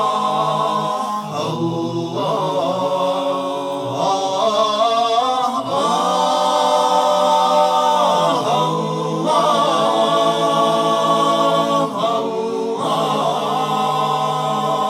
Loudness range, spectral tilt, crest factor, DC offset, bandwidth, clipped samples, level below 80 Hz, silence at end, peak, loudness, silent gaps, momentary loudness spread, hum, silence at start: 4 LU; -4.5 dB/octave; 14 dB; under 0.1%; 16 kHz; under 0.1%; -66 dBFS; 0 s; -4 dBFS; -17 LUFS; none; 6 LU; none; 0 s